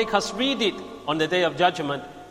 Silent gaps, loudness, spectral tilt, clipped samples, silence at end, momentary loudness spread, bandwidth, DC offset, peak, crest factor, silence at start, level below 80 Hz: none; -24 LUFS; -4 dB/octave; under 0.1%; 0 s; 9 LU; 15.5 kHz; under 0.1%; -6 dBFS; 20 dB; 0 s; -56 dBFS